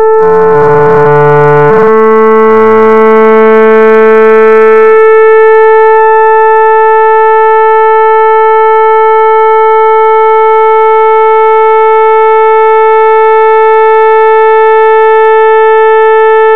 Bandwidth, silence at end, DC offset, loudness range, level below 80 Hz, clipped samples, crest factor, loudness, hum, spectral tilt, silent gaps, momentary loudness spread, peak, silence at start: 4.2 kHz; 0 s; 10%; 2 LU; -48 dBFS; 5%; 4 dB; -4 LUFS; none; -8 dB/octave; none; 2 LU; 0 dBFS; 0 s